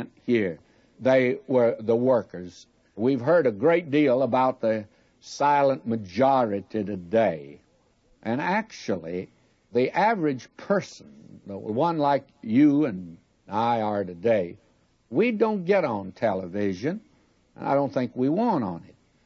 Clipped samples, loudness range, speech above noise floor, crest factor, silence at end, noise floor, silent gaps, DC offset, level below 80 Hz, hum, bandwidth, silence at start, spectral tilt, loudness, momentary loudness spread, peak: under 0.1%; 4 LU; 39 dB; 16 dB; 0.45 s; -63 dBFS; none; under 0.1%; -68 dBFS; none; 7.6 kHz; 0 s; -7 dB/octave; -25 LUFS; 14 LU; -10 dBFS